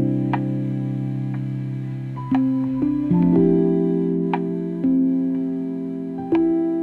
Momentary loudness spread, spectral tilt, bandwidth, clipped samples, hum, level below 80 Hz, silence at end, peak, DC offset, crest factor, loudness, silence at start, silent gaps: 10 LU; -11 dB/octave; 4.4 kHz; under 0.1%; none; -50 dBFS; 0 s; -6 dBFS; under 0.1%; 14 dB; -21 LUFS; 0 s; none